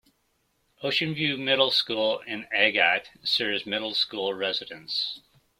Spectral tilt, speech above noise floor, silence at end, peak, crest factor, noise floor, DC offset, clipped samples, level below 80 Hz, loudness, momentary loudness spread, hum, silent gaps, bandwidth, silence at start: -4 dB/octave; 45 dB; 0.4 s; -4 dBFS; 24 dB; -71 dBFS; under 0.1%; under 0.1%; -70 dBFS; -25 LUFS; 10 LU; none; none; 16 kHz; 0.8 s